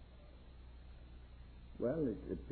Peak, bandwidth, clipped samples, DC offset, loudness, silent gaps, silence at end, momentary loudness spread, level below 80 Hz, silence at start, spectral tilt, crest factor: -26 dBFS; 4.3 kHz; under 0.1%; under 0.1%; -40 LUFS; none; 0 s; 21 LU; -56 dBFS; 0 s; -8.5 dB/octave; 18 dB